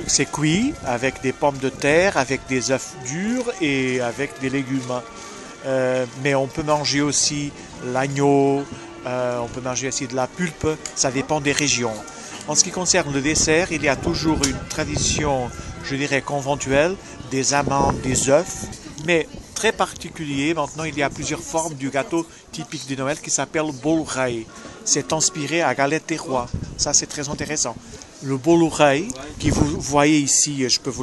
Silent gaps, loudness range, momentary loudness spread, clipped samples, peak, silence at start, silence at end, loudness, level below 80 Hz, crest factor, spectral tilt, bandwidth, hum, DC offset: none; 4 LU; 12 LU; under 0.1%; 0 dBFS; 0 s; 0 s; -21 LUFS; -42 dBFS; 22 dB; -3.5 dB/octave; 12.5 kHz; none; under 0.1%